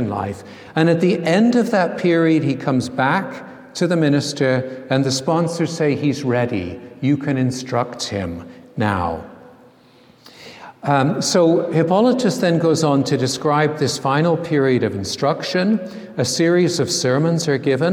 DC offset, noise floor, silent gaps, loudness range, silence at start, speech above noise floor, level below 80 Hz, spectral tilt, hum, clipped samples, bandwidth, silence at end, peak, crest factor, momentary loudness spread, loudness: under 0.1%; -50 dBFS; none; 6 LU; 0 s; 32 dB; -56 dBFS; -5.5 dB/octave; none; under 0.1%; 15 kHz; 0 s; -2 dBFS; 16 dB; 10 LU; -18 LUFS